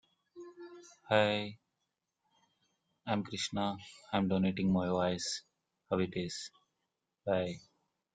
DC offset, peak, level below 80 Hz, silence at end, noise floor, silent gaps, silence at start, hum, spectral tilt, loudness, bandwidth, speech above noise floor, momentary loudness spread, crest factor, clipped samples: under 0.1%; -12 dBFS; -70 dBFS; 0.55 s; -86 dBFS; none; 0.35 s; none; -5 dB/octave; -34 LUFS; 9.4 kHz; 52 dB; 20 LU; 24 dB; under 0.1%